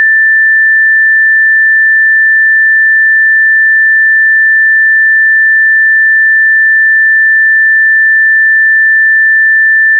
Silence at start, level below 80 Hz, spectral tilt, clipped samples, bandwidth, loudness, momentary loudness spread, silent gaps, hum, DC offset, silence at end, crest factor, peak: 0 s; under -90 dBFS; 21.5 dB/octave; under 0.1%; 1.9 kHz; -4 LUFS; 0 LU; none; none; under 0.1%; 0 s; 4 dB; -4 dBFS